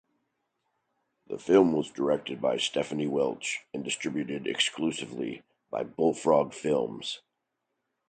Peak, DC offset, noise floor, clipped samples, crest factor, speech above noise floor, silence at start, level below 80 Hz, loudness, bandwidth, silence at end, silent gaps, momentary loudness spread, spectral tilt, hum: -8 dBFS; under 0.1%; -82 dBFS; under 0.1%; 20 dB; 54 dB; 1.3 s; -68 dBFS; -29 LUFS; 9.4 kHz; 0.95 s; none; 13 LU; -4 dB/octave; none